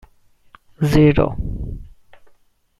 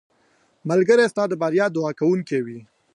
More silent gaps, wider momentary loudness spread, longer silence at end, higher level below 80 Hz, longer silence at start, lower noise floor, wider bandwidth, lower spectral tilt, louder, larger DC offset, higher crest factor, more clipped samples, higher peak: neither; first, 19 LU vs 16 LU; first, 0.95 s vs 0.3 s; first, -32 dBFS vs -72 dBFS; first, 0.8 s vs 0.65 s; second, -54 dBFS vs -62 dBFS; first, 13.5 kHz vs 11 kHz; first, -8 dB/octave vs -6.5 dB/octave; about the same, -18 LUFS vs -20 LUFS; neither; about the same, 18 dB vs 16 dB; neither; first, -2 dBFS vs -6 dBFS